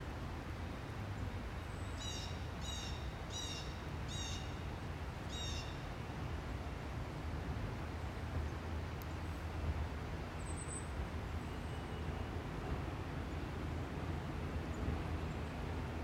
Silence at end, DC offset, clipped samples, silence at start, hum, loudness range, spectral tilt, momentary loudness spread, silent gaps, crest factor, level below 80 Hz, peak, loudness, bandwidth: 0 s; under 0.1%; under 0.1%; 0 s; none; 1 LU; -5 dB/octave; 3 LU; none; 16 dB; -48 dBFS; -28 dBFS; -44 LUFS; 16 kHz